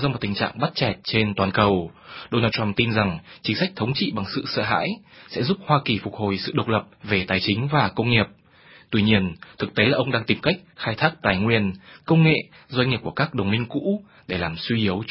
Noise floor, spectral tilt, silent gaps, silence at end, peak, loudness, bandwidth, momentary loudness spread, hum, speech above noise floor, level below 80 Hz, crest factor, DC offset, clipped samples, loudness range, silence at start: -51 dBFS; -10 dB/octave; none; 0 s; 0 dBFS; -23 LUFS; 5.8 kHz; 8 LU; none; 28 dB; -48 dBFS; 22 dB; under 0.1%; under 0.1%; 2 LU; 0 s